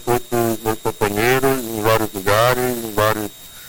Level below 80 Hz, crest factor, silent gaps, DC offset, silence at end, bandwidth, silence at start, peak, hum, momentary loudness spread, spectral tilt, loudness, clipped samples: -40 dBFS; 16 dB; none; under 0.1%; 0 s; 17 kHz; 0 s; -4 dBFS; none; 6 LU; -4.5 dB/octave; -18 LUFS; under 0.1%